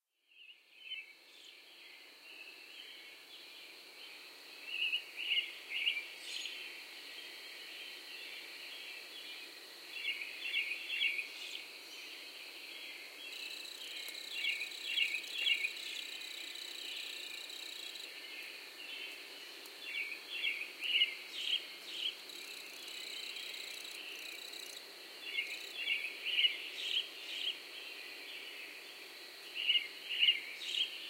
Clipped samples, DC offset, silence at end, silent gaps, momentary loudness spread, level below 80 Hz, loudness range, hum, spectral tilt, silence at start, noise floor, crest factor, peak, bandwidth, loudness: under 0.1%; under 0.1%; 0 s; none; 17 LU; under -90 dBFS; 9 LU; none; 2.5 dB/octave; 0.3 s; -63 dBFS; 24 dB; -18 dBFS; 16.5 kHz; -38 LUFS